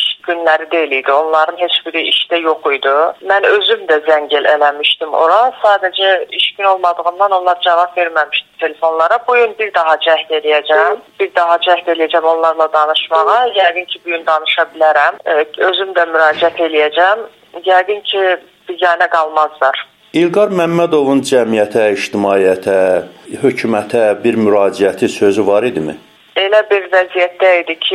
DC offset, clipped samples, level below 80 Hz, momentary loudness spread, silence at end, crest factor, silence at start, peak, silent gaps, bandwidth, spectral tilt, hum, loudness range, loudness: under 0.1%; under 0.1%; -62 dBFS; 5 LU; 0 s; 12 dB; 0 s; 0 dBFS; none; 13 kHz; -4 dB/octave; none; 2 LU; -12 LUFS